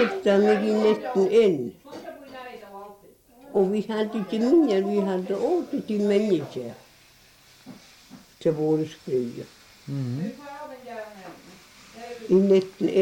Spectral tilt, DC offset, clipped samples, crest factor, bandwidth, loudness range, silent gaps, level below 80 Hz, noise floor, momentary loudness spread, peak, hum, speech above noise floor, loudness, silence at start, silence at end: -7 dB/octave; under 0.1%; under 0.1%; 16 dB; 16.5 kHz; 7 LU; none; -66 dBFS; -55 dBFS; 21 LU; -8 dBFS; none; 32 dB; -24 LUFS; 0 s; 0 s